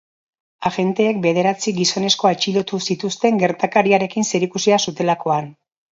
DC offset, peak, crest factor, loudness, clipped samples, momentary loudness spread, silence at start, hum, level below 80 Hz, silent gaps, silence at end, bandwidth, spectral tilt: under 0.1%; 0 dBFS; 18 dB; -18 LUFS; under 0.1%; 6 LU; 0.6 s; none; -64 dBFS; none; 0.4 s; 7.8 kHz; -4 dB/octave